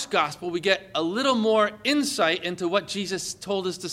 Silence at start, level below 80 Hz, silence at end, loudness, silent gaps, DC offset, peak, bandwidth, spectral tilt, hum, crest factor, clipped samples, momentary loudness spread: 0 s; -64 dBFS; 0 s; -25 LUFS; none; under 0.1%; -6 dBFS; 16.5 kHz; -3.5 dB/octave; none; 20 dB; under 0.1%; 7 LU